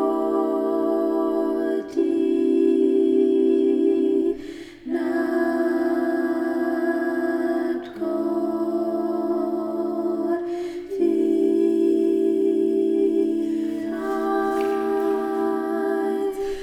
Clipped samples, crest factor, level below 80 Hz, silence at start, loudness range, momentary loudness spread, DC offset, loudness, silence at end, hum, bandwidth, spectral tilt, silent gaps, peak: under 0.1%; 14 dB; -58 dBFS; 0 s; 4 LU; 7 LU; under 0.1%; -22 LUFS; 0 s; none; 12.5 kHz; -6.5 dB/octave; none; -8 dBFS